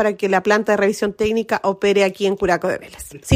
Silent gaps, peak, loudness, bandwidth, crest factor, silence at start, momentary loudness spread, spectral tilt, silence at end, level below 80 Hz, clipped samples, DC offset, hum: none; -2 dBFS; -18 LUFS; 16 kHz; 18 dB; 0 s; 8 LU; -5 dB/octave; 0 s; -48 dBFS; under 0.1%; under 0.1%; none